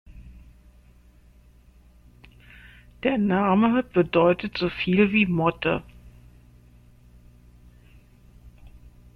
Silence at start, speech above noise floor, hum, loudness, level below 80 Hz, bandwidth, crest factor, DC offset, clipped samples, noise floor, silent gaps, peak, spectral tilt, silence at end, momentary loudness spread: 0.15 s; 32 dB; 60 Hz at -45 dBFS; -22 LUFS; -50 dBFS; 5.4 kHz; 20 dB; under 0.1%; under 0.1%; -53 dBFS; none; -6 dBFS; -8.5 dB/octave; 0.4 s; 7 LU